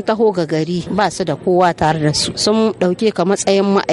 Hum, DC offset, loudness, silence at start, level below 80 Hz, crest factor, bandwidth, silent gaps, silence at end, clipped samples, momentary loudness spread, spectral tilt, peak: none; under 0.1%; -16 LUFS; 0 s; -46 dBFS; 14 dB; 11.5 kHz; none; 0 s; under 0.1%; 4 LU; -5 dB/octave; -2 dBFS